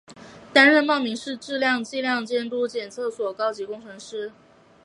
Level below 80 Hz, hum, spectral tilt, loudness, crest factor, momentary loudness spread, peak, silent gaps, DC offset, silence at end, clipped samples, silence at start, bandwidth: -70 dBFS; none; -3 dB/octave; -22 LUFS; 22 dB; 19 LU; -2 dBFS; none; under 0.1%; 0.55 s; under 0.1%; 0.1 s; 11.5 kHz